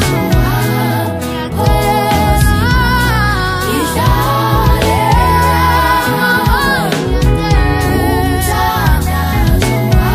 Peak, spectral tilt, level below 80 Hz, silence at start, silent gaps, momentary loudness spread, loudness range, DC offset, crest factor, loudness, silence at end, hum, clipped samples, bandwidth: 0 dBFS; -5.5 dB/octave; -18 dBFS; 0 s; none; 4 LU; 1 LU; under 0.1%; 12 dB; -12 LUFS; 0 s; none; under 0.1%; 15.5 kHz